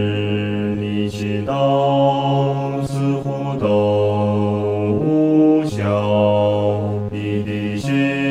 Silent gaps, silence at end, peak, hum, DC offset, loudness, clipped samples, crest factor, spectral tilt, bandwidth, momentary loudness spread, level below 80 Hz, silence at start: none; 0 s; -4 dBFS; none; under 0.1%; -18 LUFS; under 0.1%; 12 dB; -8 dB/octave; 11 kHz; 7 LU; -52 dBFS; 0 s